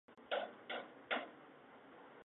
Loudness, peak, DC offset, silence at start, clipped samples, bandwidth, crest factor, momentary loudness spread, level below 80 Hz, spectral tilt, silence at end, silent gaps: -45 LUFS; -26 dBFS; under 0.1%; 0.1 s; under 0.1%; 4 kHz; 22 dB; 17 LU; under -90 dBFS; 0.5 dB/octave; 0 s; none